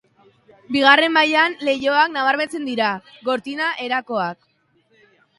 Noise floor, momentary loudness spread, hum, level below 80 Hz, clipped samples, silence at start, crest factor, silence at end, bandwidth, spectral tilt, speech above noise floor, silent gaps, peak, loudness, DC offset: -61 dBFS; 11 LU; none; -68 dBFS; under 0.1%; 0.7 s; 20 dB; 1.05 s; 11.5 kHz; -3.5 dB/octave; 42 dB; none; 0 dBFS; -18 LUFS; under 0.1%